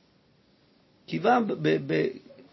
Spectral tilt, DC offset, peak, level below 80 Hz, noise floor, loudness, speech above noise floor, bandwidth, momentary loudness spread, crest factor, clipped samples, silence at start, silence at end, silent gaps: -7.5 dB/octave; under 0.1%; -10 dBFS; -74 dBFS; -63 dBFS; -26 LUFS; 38 dB; 6 kHz; 11 LU; 18 dB; under 0.1%; 1.1 s; 0.1 s; none